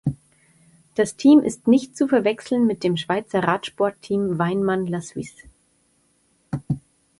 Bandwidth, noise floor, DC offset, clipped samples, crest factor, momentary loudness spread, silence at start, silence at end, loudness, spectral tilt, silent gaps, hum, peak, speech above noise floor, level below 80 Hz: 11.5 kHz; -64 dBFS; under 0.1%; under 0.1%; 18 dB; 16 LU; 0.05 s; 0.4 s; -21 LUFS; -6.5 dB/octave; none; none; -4 dBFS; 44 dB; -56 dBFS